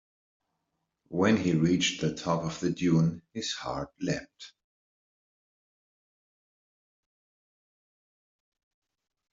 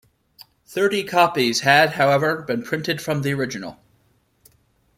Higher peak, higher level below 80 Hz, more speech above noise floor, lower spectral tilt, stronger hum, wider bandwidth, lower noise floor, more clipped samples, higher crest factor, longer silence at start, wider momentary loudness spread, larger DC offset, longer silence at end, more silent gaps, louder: second, -12 dBFS vs -2 dBFS; about the same, -64 dBFS vs -60 dBFS; first, 54 dB vs 43 dB; about the same, -5.5 dB/octave vs -4.5 dB/octave; neither; second, 7.8 kHz vs 16.5 kHz; first, -82 dBFS vs -62 dBFS; neither; about the same, 20 dB vs 20 dB; first, 1.1 s vs 0.4 s; about the same, 11 LU vs 12 LU; neither; first, 4.85 s vs 1.25 s; neither; second, -29 LUFS vs -19 LUFS